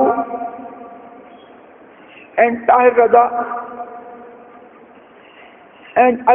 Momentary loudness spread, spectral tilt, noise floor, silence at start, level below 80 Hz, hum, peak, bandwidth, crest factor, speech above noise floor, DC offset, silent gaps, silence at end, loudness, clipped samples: 25 LU; -3.5 dB/octave; -44 dBFS; 0 s; -62 dBFS; none; 0 dBFS; 3.5 kHz; 18 dB; 31 dB; under 0.1%; none; 0 s; -15 LUFS; under 0.1%